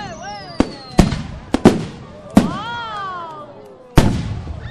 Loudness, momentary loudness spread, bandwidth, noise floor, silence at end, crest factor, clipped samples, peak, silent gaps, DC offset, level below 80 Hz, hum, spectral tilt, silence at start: -19 LUFS; 17 LU; 13.5 kHz; -39 dBFS; 0 s; 18 dB; 0.2%; 0 dBFS; none; under 0.1%; -28 dBFS; none; -6.5 dB/octave; 0 s